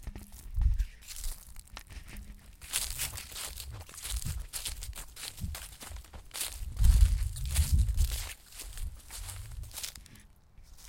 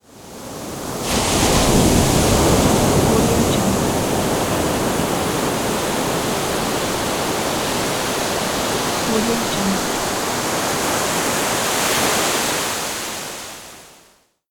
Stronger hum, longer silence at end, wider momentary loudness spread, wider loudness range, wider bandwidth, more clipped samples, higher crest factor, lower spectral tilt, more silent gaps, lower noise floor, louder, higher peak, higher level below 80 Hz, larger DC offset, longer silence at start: neither; second, 0 s vs 0.6 s; first, 18 LU vs 10 LU; first, 7 LU vs 4 LU; second, 17 kHz vs over 20 kHz; neither; first, 24 dB vs 18 dB; about the same, -3 dB/octave vs -3.5 dB/octave; neither; about the same, -56 dBFS vs -54 dBFS; second, -35 LUFS vs -18 LUFS; second, -8 dBFS vs -2 dBFS; about the same, -34 dBFS vs -34 dBFS; neither; about the same, 0 s vs 0.1 s